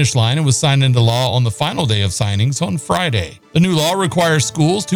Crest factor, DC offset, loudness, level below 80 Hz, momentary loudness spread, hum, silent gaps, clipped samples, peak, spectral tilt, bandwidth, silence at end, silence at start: 12 dB; 0.2%; -15 LUFS; -44 dBFS; 5 LU; none; none; under 0.1%; -2 dBFS; -5 dB/octave; 18.5 kHz; 0 s; 0 s